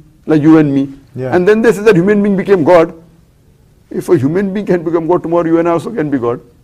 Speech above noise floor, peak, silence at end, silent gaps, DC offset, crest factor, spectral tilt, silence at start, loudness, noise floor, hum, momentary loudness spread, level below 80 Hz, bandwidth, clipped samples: 36 dB; 0 dBFS; 0.25 s; none; under 0.1%; 12 dB; -8 dB/octave; 0.25 s; -11 LUFS; -47 dBFS; none; 9 LU; -46 dBFS; 13.5 kHz; 0.3%